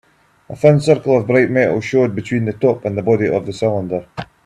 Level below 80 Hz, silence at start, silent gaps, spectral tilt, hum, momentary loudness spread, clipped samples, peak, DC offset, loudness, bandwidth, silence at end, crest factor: -52 dBFS; 0.5 s; none; -7.5 dB/octave; none; 9 LU; under 0.1%; 0 dBFS; under 0.1%; -16 LUFS; 11 kHz; 0.2 s; 16 dB